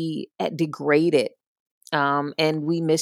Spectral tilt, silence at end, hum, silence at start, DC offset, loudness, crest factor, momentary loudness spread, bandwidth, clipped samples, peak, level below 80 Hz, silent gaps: -5.5 dB/octave; 0 s; none; 0 s; under 0.1%; -23 LUFS; 18 dB; 10 LU; 14.5 kHz; under 0.1%; -6 dBFS; -80 dBFS; 1.47-1.81 s